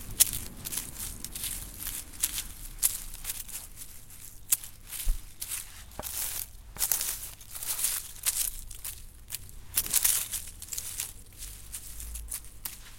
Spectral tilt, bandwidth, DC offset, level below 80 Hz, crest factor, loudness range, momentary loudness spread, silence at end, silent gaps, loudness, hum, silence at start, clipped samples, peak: 0 dB/octave; 17 kHz; under 0.1%; -44 dBFS; 34 dB; 4 LU; 16 LU; 0 s; none; -31 LUFS; none; 0 s; under 0.1%; 0 dBFS